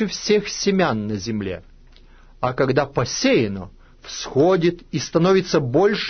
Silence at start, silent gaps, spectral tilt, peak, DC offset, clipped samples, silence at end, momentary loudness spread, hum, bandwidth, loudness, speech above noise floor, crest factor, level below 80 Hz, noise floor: 0 s; none; -5 dB/octave; -4 dBFS; under 0.1%; under 0.1%; 0 s; 13 LU; none; 6.6 kHz; -20 LUFS; 27 dB; 16 dB; -46 dBFS; -47 dBFS